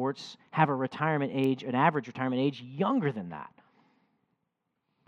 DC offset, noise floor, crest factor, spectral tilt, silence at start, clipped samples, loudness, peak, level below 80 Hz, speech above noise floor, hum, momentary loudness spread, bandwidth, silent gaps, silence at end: under 0.1%; -81 dBFS; 24 dB; -7.5 dB/octave; 0 s; under 0.1%; -29 LUFS; -8 dBFS; -80 dBFS; 52 dB; none; 14 LU; 8.2 kHz; none; 1.6 s